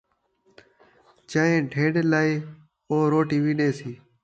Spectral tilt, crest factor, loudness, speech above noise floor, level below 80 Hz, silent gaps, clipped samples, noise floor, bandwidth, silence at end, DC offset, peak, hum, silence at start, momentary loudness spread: -7 dB/octave; 16 dB; -23 LUFS; 44 dB; -66 dBFS; none; under 0.1%; -66 dBFS; 8.4 kHz; 0.3 s; under 0.1%; -8 dBFS; none; 1.3 s; 11 LU